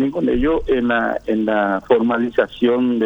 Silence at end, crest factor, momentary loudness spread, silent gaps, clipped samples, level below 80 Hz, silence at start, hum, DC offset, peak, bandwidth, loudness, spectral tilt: 0 s; 16 dB; 3 LU; none; under 0.1%; -36 dBFS; 0 s; none; under 0.1%; -2 dBFS; 5.4 kHz; -18 LUFS; -7.5 dB/octave